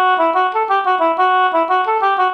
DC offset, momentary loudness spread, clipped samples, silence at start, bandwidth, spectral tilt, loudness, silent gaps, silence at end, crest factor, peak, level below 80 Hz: under 0.1%; 2 LU; under 0.1%; 0 s; 6.2 kHz; -3 dB/octave; -15 LUFS; none; 0 s; 12 dB; -4 dBFS; -64 dBFS